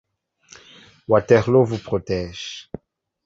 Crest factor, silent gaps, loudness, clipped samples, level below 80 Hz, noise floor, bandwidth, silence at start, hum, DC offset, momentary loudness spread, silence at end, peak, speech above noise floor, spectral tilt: 20 dB; none; -19 LUFS; under 0.1%; -48 dBFS; -53 dBFS; 7.8 kHz; 1.1 s; none; under 0.1%; 23 LU; 0.65 s; -2 dBFS; 34 dB; -6.5 dB/octave